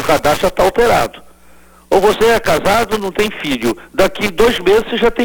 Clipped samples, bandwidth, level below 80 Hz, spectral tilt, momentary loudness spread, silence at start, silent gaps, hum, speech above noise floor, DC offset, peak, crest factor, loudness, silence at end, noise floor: under 0.1%; over 20 kHz; -34 dBFS; -4 dB/octave; 6 LU; 0 s; none; none; 31 dB; 1%; 0 dBFS; 14 dB; -14 LUFS; 0 s; -44 dBFS